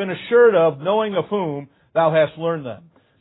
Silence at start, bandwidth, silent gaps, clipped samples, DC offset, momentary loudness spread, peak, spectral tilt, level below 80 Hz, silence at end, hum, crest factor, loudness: 0 s; 4 kHz; none; under 0.1%; under 0.1%; 14 LU; -2 dBFS; -11 dB/octave; -62 dBFS; 0.45 s; none; 16 dB; -19 LUFS